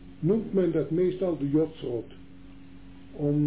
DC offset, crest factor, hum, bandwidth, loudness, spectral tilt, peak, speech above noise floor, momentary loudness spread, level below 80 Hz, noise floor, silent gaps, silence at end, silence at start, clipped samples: 0.4%; 14 dB; none; 4 kHz; -28 LUFS; -12.5 dB/octave; -14 dBFS; 22 dB; 10 LU; -54 dBFS; -49 dBFS; none; 0 s; 0 s; under 0.1%